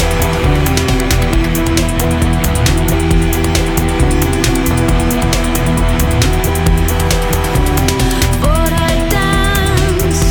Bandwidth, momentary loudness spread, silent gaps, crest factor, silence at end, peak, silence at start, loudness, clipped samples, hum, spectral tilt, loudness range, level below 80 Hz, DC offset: over 20 kHz; 1 LU; none; 12 dB; 0 s; 0 dBFS; 0 s; -13 LUFS; under 0.1%; none; -5 dB/octave; 0 LU; -16 dBFS; under 0.1%